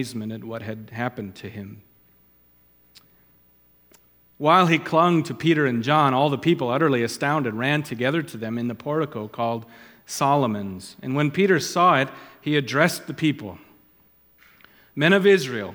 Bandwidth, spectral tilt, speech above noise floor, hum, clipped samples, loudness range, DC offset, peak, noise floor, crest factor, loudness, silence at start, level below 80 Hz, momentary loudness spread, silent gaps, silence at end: 19.5 kHz; -5.5 dB/octave; 36 dB; none; under 0.1%; 14 LU; under 0.1%; -2 dBFS; -58 dBFS; 22 dB; -22 LUFS; 0 s; -68 dBFS; 16 LU; none; 0 s